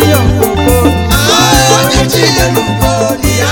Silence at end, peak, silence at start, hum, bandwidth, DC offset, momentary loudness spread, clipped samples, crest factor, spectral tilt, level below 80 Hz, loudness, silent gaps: 0 s; 0 dBFS; 0 s; none; over 20 kHz; 0.5%; 5 LU; 0.7%; 8 dB; -4 dB/octave; -20 dBFS; -8 LUFS; none